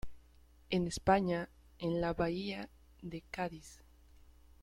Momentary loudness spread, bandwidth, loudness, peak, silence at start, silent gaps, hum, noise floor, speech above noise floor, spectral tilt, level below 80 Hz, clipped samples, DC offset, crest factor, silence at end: 20 LU; 13.5 kHz; -36 LUFS; -14 dBFS; 0.05 s; none; none; -62 dBFS; 27 dB; -6 dB/octave; -56 dBFS; under 0.1%; under 0.1%; 24 dB; 0.9 s